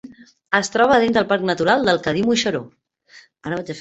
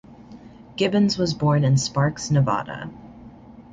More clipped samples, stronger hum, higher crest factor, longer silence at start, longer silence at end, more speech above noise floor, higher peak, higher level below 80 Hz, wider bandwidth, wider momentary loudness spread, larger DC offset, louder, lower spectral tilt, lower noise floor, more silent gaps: neither; neither; about the same, 18 dB vs 16 dB; about the same, 0.05 s vs 0.1 s; about the same, 0 s vs 0.1 s; first, 31 dB vs 23 dB; first, -2 dBFS vs -8 dBFS; about the same, -54 dBFS vs -50 dBFS; about the same, 8.4 kHz vs 9.2 kHz; second, 12 LU vs 17 LU; neither; first, -18 LUFS vs -21 LUFS; second, -4.5 dB/octave vs -6 dB/octave; first, -50 dBFS vs -44 dBFS; neither